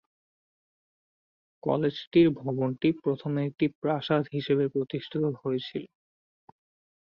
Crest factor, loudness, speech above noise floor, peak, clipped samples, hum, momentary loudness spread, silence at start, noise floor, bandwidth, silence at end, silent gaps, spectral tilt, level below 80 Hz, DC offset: 20 dB; -28 LUFS; over 63 dB; -10 dBFS; under 0.1%; none; 9 LU; 1.65 s; under -90 dBFS; 5.8 kHz; 1.15 s; 2.07-2.11 s, 3.75-3.82 s; -9 dB/octave; -68 dBFS; under 0.1%